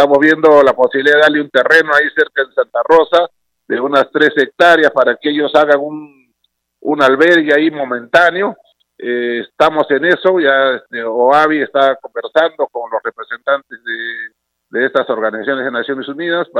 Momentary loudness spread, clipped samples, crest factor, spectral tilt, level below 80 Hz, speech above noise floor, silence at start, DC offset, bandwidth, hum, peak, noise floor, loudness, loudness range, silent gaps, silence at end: 12 LU; 0.2%; 12 dB; -5 dB/octave; -58 dBFS; 54 dB; 0 s; under 0.1%; 12 kHz; none; 0 dBFS; -66 dBFS; -12 LUFS; 6 LU; none; 0 s